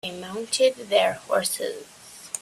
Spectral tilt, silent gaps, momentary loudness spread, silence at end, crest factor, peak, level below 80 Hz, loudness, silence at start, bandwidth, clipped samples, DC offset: -1.5 dB/octave; none; 18 LU; 0 s; 18 dB; -6 dBFS; -68 dBFS; -24 LUFS; 0.05 s; 15 kHz; under 0.1%; under 0.1%